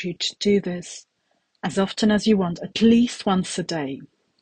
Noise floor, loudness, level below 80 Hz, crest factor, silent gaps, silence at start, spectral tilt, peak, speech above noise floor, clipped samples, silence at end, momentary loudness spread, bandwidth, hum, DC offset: -70 dBFS; -22 LUFS; -56 dBFS; 16 dB; none; 0 s; -5 dB/octave; -6 dBFS; 48 dB; under 0.1%; 0.35 s; 15 LU; 9.6 kHz; none; under 0.1%